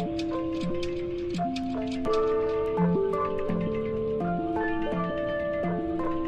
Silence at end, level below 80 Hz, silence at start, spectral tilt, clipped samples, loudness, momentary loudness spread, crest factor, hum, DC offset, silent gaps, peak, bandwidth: 0 s; -46 dBFS; 0 s; -7.5 dB/octave; under 0.1%; -29 LUFS; 5 LU; 14 dB; none; under 0.1%; none; -14 dBFS; 9.6 kHz